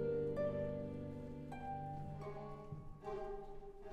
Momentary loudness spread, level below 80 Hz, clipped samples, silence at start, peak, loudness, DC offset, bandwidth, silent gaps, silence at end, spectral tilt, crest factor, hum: 12 LU; -58 dBFS; under 0.1%; 0 s; -30 dBFS; -46 LUFS; under 0.1%; 10 kHz; none; 0 s; -9 dB/octave; 16 dB; none